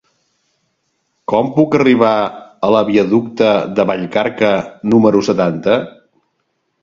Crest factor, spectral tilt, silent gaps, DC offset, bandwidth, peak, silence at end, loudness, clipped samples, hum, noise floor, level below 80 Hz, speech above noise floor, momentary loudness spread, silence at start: 14 dB; -7 dB/octave; none; under 0.1%; 7.4 kHz; 0 dBFS; 0.95 s; -14 LUFS; under 0.1%; none; -67 dBFS; -54 dBFS; 54 dB; 7 LU; 1.3 s